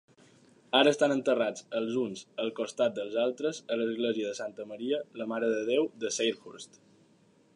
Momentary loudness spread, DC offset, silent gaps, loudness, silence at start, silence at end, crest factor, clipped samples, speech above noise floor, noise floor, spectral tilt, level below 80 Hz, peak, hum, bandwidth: 13 LU; under 0.1%; none; -30 LUFS; 0.75 s; 0.9 s; 20 dB; under 0.1%; 34 dB; -64 dBFS; -3.5 dB/octave; -84 dBFS; -10 dBFS; none; 11 kHz